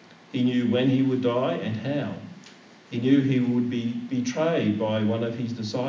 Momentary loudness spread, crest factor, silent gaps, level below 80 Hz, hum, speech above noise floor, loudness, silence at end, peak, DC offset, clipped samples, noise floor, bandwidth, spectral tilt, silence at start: 9 LU; 16 dB; none; -68 dBFS; none; 25 dB; -25 LUFS; 0 s; -8 dBFS; under 0.1%; under 0.1%; -49 dBFS; 7.4 kHz; -7 dB/octave; 0.35 s